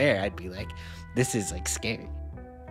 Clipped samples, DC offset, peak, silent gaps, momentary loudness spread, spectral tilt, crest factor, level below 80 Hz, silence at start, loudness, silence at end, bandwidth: under 0.1%; under 0.1%; -10 dBFS; none; 14 LU; -4 dB/octave; 20 dB; -42 dBFS; 0 s; -31 LUFS; 0 s; 16 kHz